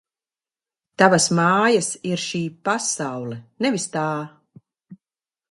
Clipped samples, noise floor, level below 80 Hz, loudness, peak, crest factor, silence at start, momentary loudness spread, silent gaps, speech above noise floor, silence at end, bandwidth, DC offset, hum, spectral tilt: under 0.1%; under -90 dBFS; -66 dBFS; -21 LUFS; 0 dBFS; 22 dB; 1 s; 14 LU; none; over 69 dB; 0.55 s; 11.5 kHz; under 0.1%; none; -4 dB/octave